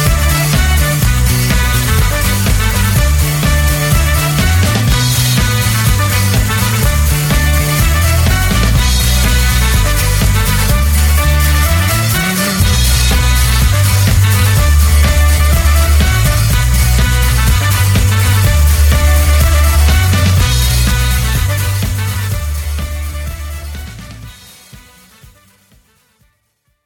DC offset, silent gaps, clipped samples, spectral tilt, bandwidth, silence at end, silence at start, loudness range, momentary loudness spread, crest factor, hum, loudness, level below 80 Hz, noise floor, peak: under 0.1%; none; under 0.1%; -4 dB/octave; 18.5 kHz; 2.05 s; 0 s; 7 LU; 6 LU; 10 dB; none; -11 LUFS; -14 dBFS; -62 dBFS; 0 dBFS